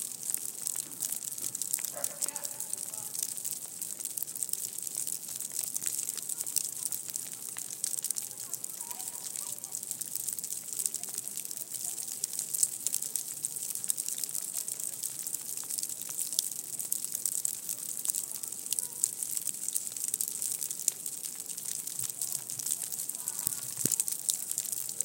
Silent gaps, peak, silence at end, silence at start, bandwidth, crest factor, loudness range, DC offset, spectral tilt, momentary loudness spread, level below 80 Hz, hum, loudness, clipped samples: none; -4 dBFS; 0 s; 0 s; 17 kHz; 32 dB; 3 LU; under 0.1%; 0.5 dB/octave; 6 LU; under -90 dBFS; none; -33 LUFS; under 0.1%